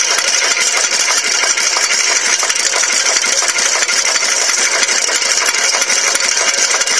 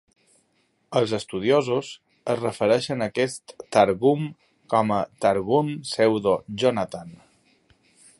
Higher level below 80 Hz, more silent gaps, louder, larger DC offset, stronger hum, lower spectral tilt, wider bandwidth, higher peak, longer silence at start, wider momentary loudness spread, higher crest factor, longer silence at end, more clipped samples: about the same, -64 dBFS vs -60 dBFS; neither; first, -11 LUFS vs -23 LUFS; first, 0.4% vs under 0.1%; neither; second, 3 dB/octave vs -5.5 dB/octave; about the same, 11 kHz vs 11.5 kHz; first, 0 dBFS vs -4 dBFS; second, 0 s vs 0.9 s; second, 1 LU vs 9 LU; second, 14 dB vs 22 dB; second, 0 s vs 1.05 s; neither